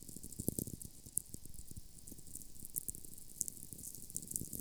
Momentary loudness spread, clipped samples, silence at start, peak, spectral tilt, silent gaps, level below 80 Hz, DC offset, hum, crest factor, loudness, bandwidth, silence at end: 12 LU; under 0.1%; 0 s; -12 dBFS; -4 dB/octave; none; -60 dBFS; under 0.1%; none; 34 dB; -45 LUFS; 19.5 kHz; 0 s